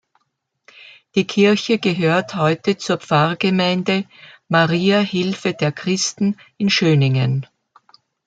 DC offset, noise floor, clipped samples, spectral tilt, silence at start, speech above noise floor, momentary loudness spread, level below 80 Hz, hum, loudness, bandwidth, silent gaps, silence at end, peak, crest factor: under 0.1%; -72 dBFS; under 0.1%; -5.5 dB/octave; 1.15 s; 54 dB; 7 LU; -62 dBFS; none; -18 LUFS; 9 kHz; none; 0.8 s; -2 dBFS; 16 dB